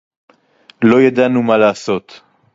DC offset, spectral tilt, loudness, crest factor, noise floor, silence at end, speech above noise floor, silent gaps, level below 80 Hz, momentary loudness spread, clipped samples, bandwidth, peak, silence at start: under 0.1%; -6.5 dB/octave; -13 LUFS; 14 dB; -49 dBFS; 0.55 s; 37 dB; none; -56 dBFS; 10 LU; under 0.1%; 7.8 kHz; 0 dBFS; 0.8 s